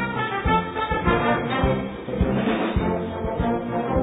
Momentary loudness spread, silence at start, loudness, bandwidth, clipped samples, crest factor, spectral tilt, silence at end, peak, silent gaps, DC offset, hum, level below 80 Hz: 5 LU; 0 s; -23 LUFS; 4 kHz; under 0.1%; 18 dB; -9.5 dB/octave; 0 s; -6 dBFS; none; under 0.1%; none; -34 dBFS